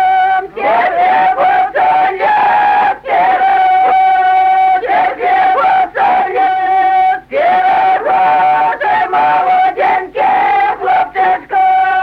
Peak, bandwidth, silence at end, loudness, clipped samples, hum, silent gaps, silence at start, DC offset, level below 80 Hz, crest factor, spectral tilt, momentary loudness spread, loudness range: -2 dBFS; 5.2 kHz; 0 s; -11 LUFS; under 0.1%; none; none; 0 s; under 0.1%; -50 dBFS; 8 dB; -5 dB/octave; 3 LU; 1 LU